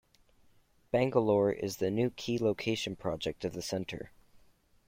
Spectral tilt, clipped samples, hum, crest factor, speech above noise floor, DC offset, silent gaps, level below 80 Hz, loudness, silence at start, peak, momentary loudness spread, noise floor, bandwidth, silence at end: -5.5 dB/octave; under 0.1%; none; 20 dB; 34 dB; under 0.1%; none; -62 dBFS; -32 LUFS; 0.95 s; -12 dBFS; 10 LU; -65 dBFS; 16.5 kHz; 0.8 s